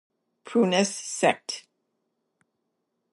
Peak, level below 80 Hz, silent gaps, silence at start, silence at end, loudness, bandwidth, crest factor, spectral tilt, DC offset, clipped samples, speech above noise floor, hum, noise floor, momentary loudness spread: -6 dBFS; -82 dBFS; none; 0.45 s; 1.55 s; -25 LUFS; 11.5 kHz; 22 dB; -3.5 dB/octave; under 0.1%; under 0.1%; 54 dB; none; -78 dBFS; 12 LU